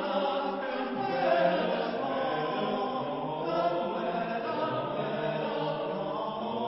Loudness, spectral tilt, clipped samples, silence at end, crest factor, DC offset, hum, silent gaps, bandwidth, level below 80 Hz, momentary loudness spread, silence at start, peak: -31 LUFS; -9.5 dB/octave; under 0.1%; 0 s; 16 dB; under 0.1%; none; none; 5.8 kHz; -68 dBFS; 6 LU; 0 s; -14 dBFS